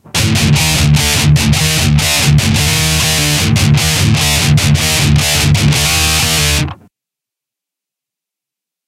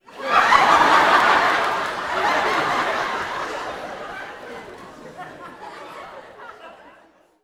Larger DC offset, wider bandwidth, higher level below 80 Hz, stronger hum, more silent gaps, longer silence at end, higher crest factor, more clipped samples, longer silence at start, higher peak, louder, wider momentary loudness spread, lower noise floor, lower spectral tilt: neither; about the same, 16.5 kHz vs 17 kHz; first, -24 dBFS vs -54 dBFS; neither; neither; first, 2.15 s vs 0.7 s; second, 12 dB vs 22 dB; neither; about the same, 0.15 s vs 0.1 s; about the same, 0 dBFS vs 0 dBFS; first, -10 LUFS vs -18 LUFS; second, 1 LU vs 25 LU; first, -84 dBFS vs -54 dBFS; about the same, -3.5 dB/octave vs -2.5 dB/octave